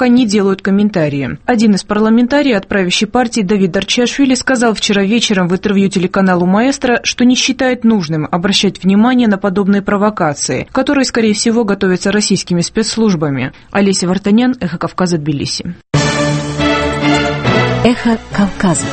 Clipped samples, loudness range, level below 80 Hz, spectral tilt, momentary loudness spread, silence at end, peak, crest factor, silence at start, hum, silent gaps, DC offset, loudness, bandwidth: under 0.1%; 2 LU; -38 dBFS; -5 dB/octave; 5 LU; 0 s; 0 dBFS; 12 dB; 0 s; none; none; under 0.1%; -12 LUFS; 8.8 kHz